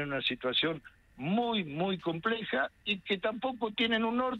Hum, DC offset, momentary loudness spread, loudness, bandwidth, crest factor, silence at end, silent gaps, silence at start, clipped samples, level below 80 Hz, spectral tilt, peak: none; under 0.1%; 5 LU; -32 LUFS; 7.2 kHz; 16 dB; 0 s; none; 0 s; under 0.1%; -64 dBFS; -6.5 dB/octave; -16 dBFS